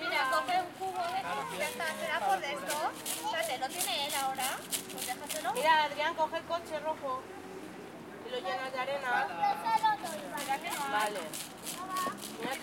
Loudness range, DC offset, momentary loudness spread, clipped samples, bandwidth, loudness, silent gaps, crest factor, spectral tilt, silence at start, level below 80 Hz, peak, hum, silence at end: 3 LU; under 0.1%; 10 LU; under 0.1%; 17 kHz; -33 LUFS; none; 22 dB; -1.5 dB/octave; 0 s; -74 dBFS; -12 dBFS; none; 0 s